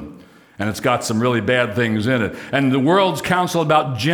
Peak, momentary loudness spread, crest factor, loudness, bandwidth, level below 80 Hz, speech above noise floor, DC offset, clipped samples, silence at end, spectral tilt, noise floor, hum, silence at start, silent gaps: -2 dBFS; 6 LU; 16 dB; -18 LUFS; over 20 kHz; -54 dBFS; 26 dB; under 0.1%; under 0.1%; 0 s; -5.5 dB/octave; -43 dBFS; none; 0 s; none